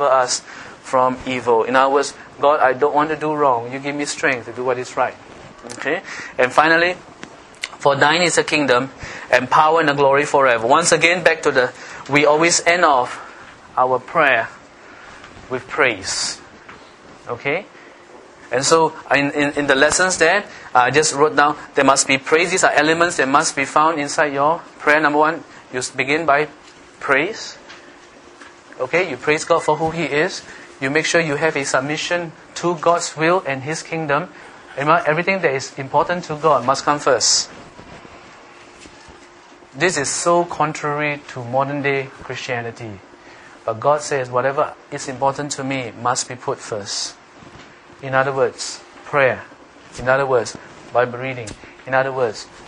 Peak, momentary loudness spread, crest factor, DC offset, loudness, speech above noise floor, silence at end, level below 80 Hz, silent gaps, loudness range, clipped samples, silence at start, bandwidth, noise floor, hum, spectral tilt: 0 dBFS; 15 LU; 18 dB; under 0.1%; -18 LUFS; 27 dB; 0 s; -56 dBFS; none; 7 LU; under 0.1%; 0 s; 11 kHz; -44 dBFS; none; -3 dB/octave